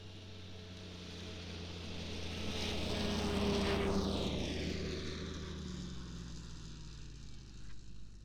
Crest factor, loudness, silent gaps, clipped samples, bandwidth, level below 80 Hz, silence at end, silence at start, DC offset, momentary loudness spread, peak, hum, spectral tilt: 18 dB; -40 LUFS; none; under 0.1%; 17.5 kHz; -52 dBFS; 0 s; 0 s; under 0.1%; 18 LU; -22 dBFS; none; -5 dB/octave